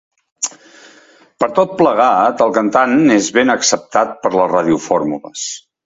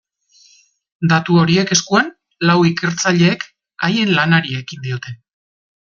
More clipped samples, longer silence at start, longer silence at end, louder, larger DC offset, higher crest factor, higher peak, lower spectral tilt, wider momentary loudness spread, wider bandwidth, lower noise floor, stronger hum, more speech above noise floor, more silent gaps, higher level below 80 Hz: neither; second, 0.4 s vs 1 s; second, 0.25 s vs 0.75 s; about the same, -14 LUFS vs -16 LUFS; neither; about the same, 14 dB vs 16 dB; about the same, 0 dBFS vs 0 dBFS; about the same, -3.5 dB/octave vs -4.5 dB/octave; about the same, 11 LU vs 12 LU; about the same, 8 kHz vs 7.4 kHz; second, -47 dBFS vs -52 dBFS; neither; second, 33 dB vs 37 dB; neither; about the same, -56 dBFS vs -56 dBFS